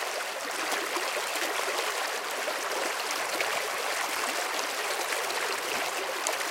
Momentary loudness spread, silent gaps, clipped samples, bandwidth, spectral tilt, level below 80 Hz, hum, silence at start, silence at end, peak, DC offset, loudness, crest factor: 2 LU; none; under 0.1%; 17 kHz; 0.5 dB/octave; -80 dBFS; none; 0 s; 0 s; -6 dBFS; under 0.1%; -29 LUFS; 26 dB